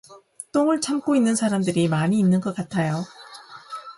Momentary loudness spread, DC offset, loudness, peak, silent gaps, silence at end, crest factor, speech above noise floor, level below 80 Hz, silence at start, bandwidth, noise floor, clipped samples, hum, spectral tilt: 19 LU; under 0.1%; -22 LUFS; -10 dBFS; none; 0.05 s; 14 dB; 23 dB; -62 dBFS; 0.1 s; 11.5 kHz; -44 dBFS; under 0.1%; none; -6 dB/octave